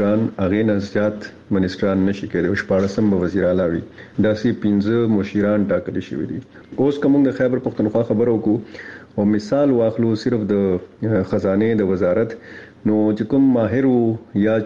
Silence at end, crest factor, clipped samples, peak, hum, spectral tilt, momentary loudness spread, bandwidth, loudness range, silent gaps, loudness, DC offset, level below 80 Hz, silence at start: 0 s; 12 dB; under 0.1%; -6 dBFS; none; -8.5 dB/octave; 9 LU; 7.4 kHz; 1 LU; none; -19 LUFS; 0.2%; -52 dBFS; 0 s